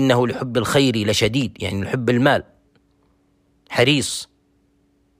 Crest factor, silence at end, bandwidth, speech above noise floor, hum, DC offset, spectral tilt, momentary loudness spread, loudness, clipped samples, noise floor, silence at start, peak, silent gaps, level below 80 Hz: 18 dB; 0.95 s; 16 kHz; 43 dB; none; under 0.1%; -4.5 dB/octave; 9 LU; -19 LUFS; under 0.1%; -62 dBFS; 0 s; -4 dBFS; none; -50 dBFS